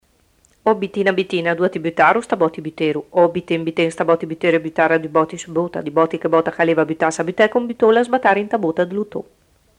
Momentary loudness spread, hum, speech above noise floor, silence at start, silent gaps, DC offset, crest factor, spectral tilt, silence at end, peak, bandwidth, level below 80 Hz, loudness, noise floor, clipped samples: 7 LU; none; 40 dB; 0.65 s; none; under 0.1%; 18 dB; -5.5 dB/octave; 0.55 s; 0 dBFS; 10.5 kHz; -60 dBFS; -18 LUFS; -58 dBFS; under 0.1%